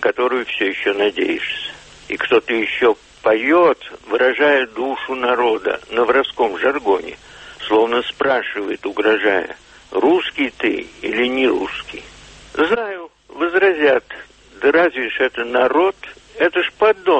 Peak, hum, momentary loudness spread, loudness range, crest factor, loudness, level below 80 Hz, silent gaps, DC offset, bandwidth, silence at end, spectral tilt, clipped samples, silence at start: -2 dBFS; none; 14 LU; 3 LU; 14 dB; -17 LUFS; -54 dBFS; none; under 0.1%; 8.4 kHz; 0 s; -4.5 dB/octave; under 0.1%; 0 s